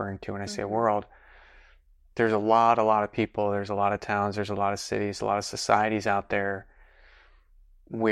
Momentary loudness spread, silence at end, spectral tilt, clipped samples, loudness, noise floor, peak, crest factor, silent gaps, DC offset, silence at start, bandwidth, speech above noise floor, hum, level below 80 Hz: 12 LU; 0 s; -5 dB/octave; under 0.1%; -26 LUFS; -58 dBFS; -6 dBFS; 22 dB; none; under 0.1%; 0 s; 13 kHz; 32 dB; none; -58 dBFS